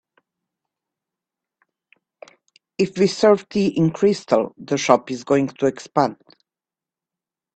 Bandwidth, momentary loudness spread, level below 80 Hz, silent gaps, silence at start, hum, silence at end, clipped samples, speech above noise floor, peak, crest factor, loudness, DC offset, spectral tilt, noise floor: 8.8 kHz; 7 LU; -62 dBFS; none; 2.8 s; none; 1.45 s; under 0.1%; 71 dB; 0 dBFS; 22 dB; -20 LUFS; under 0.1%; -5.5 dB/octave; -90 dBFS